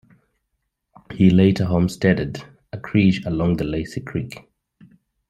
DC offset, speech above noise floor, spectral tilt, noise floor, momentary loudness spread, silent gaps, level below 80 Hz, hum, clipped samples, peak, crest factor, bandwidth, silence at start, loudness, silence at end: under 0.1%; 57 dB; -7.5 dB/octave; -75 dBFS; 20 LU; none; -46 dBFS; none; under 0.1%; -2 dBFS; 18 dB; 11.5 kHz; 1.1 s; -20 LUFS; 0.9 s